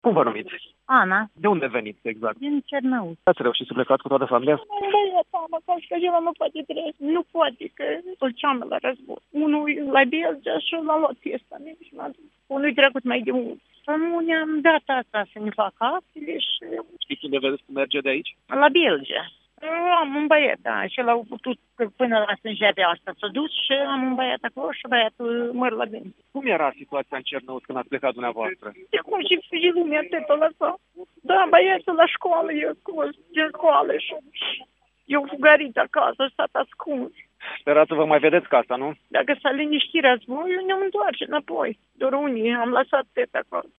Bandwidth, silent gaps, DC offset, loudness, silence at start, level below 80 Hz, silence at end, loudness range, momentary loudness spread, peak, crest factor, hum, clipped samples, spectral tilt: 4 kHz; none; under 0.1%; -22 LUFS; 0.05 s; -72 dBFS; 0.15 s; 5 LU; 13 LU; 0 dBFS; 22 dB; none; under 0.1%; -7 dB/octave